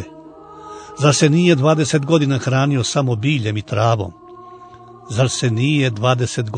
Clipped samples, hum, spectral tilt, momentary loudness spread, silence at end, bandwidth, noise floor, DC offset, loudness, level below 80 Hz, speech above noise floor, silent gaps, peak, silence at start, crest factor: under 0.1%; none; -5.5 dB/octave; 12 LU; 0 s; 9.6 kHz; -40 dBFS; under 0.1%; -17 LUFS; -54 dBFS; 24 dB; none; 0 dBFS; 0 s; 18 dB